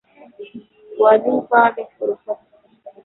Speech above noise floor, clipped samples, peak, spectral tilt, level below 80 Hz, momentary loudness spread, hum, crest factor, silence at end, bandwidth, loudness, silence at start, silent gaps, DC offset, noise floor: 27 dB; under 0.1%; -2 dBFS; -9.5 dB/octave; -68 dBFS; 23 LU; none; 18 dB; 0.15 s; 4.1 kHz; -17 LUFS; 0.4 s; none; under 0.1%; -44 dBFS